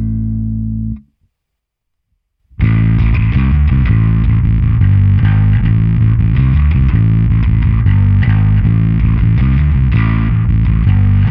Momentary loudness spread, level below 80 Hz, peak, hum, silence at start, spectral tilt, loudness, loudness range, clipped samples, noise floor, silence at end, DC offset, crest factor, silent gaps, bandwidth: 6 LU; -16 dBFS; 0 dBFS; none; 0 s; -11.5 dB/octave; -12 LUFS; 4 LU; under 0.1%; -74 dBFS; 0 s; under 0.1%; 10 dB; none; 3.9 kHz